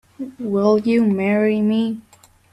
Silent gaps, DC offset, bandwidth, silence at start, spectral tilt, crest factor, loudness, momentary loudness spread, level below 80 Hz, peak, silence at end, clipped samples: none; under 0.1%; 10 kHz; 0.2 s; -8 dB/octave; 14 dB; -18 LUFS; 13 LU; -60 dBFS; -6 dBFS; 0.5 s; under 0.1%